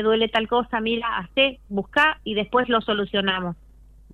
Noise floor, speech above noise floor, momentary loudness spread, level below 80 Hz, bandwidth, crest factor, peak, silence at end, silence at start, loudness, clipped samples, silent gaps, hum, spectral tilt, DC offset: -48 dBFS; 26 dB; 7 LU; -48 dBFS; 10.5 kHz; 16 dB; -6 dBFS; 0.6 s; 0 s; -22 LUFS; under 0.1%; none; none; -6 dB/octave; under 0.1%